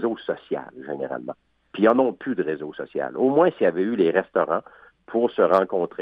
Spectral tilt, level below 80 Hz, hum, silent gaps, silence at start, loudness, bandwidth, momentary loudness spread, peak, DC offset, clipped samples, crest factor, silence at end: -8.5 dB/octave; -70 dBFS; none; none; 0 s; -23 LUFS; 5.4 kHz; 13 LU; -4 dBFS; under 0.1%; under 0.1%; 18 dB; 0 s